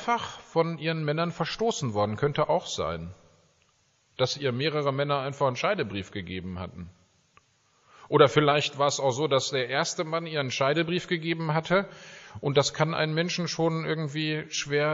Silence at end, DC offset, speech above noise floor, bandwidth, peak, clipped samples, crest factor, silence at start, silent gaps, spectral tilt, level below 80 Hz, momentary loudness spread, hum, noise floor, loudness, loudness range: 0 s; under 0.1%; 40 dB; 7.6 kHz; -6 dBFS; under 0.1%; 22 dB; 0 s; none; -4 dB/octave; -60 dBFS; 11 LU; none; -67 dBFS; -27 LUFS; 4 LU